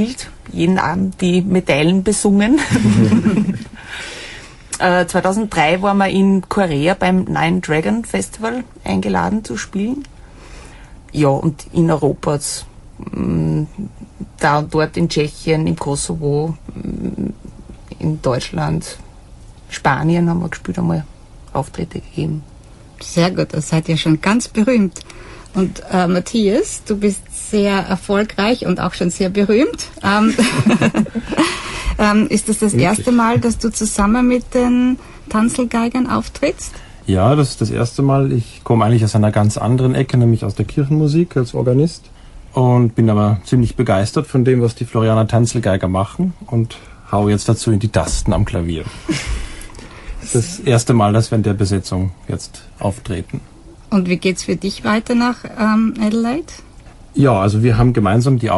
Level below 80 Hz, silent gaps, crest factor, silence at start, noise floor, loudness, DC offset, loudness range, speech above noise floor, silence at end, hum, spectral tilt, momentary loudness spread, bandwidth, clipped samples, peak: -36 dBFS; none; 14 dB; 0 s; -39 dBFS; -16 LUFS; under 0.1%; 5 LU; 24 dB; 0 s; none; -6 dB/octave; 12 LU; 11.5 kHz; under 0.1%; -2 dBFS